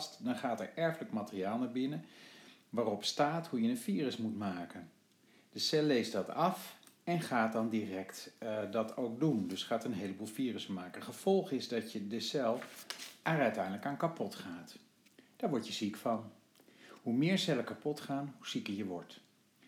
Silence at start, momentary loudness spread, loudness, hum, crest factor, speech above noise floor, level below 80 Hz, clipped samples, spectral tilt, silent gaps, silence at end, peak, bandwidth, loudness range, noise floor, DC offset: 0 s; 13 LU; -37 LUFS; none; 20 dB; 31 dB; -90 dBFS; under 0.1%; -5 dB/octave; none; 0.5 s; -18 dBFS; 19 kHz; 3 LU; -67 dBFS; under 0.1%